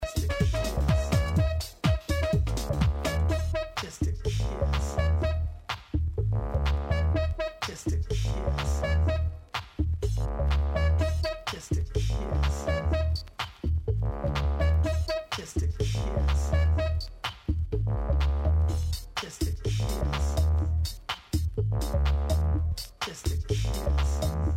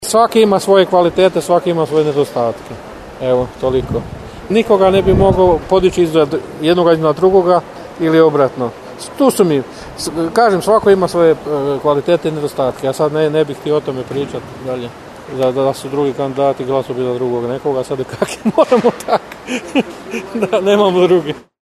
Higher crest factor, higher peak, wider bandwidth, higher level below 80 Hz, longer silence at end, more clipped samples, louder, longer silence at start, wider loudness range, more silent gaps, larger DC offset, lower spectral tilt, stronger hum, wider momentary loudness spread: about the same, 16 dB vs 14 dB; second, -12 dBFS vs 0 dBFS; first, 15 kHz vs 13.5 kHz; first, -30 dBFS vs -38 dBFS; second, 0 s vs 0.25 s; neither; second, -29 LUFS vs -14 LUFS; about the same, 0 s vs 0 s; second, 2 LU vs 5 LU; neither; neither; about the same, -6 dB/octave vs -6 dB/octave; neither; second, 6 LU vs 13 LU